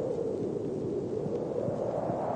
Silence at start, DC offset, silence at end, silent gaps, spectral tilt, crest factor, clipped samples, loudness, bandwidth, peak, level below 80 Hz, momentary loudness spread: 0 s; under 0.1%; 0 s; none; -9 dB/octave; 12 dB; under 0.1%; -33 LUFS; 9.2 kHz; -20 dBFS; -60 dBFS; 1 LU